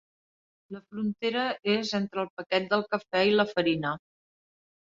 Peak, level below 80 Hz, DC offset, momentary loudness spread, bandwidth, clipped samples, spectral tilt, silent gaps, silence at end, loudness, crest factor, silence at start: -10 dBFS; -70 dBFS; under 0.1%; 13 LU; 7.6 kHz; under 0.1%; -5.5 dB/octave; 2.30-2.37 s; 0.85 s; -28 LUFS; 20 dB; 0.7 s